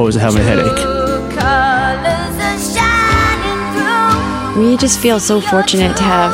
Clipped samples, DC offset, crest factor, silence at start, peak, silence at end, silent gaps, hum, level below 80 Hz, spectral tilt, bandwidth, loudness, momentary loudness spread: under 0.1%; under 0.1%; 12 dB; 0 s; 0 dBFS; 0 s; none; none; -28 dBFS; -4 dB/octave; 16.5 kHz; -13 LUFS; 5 LU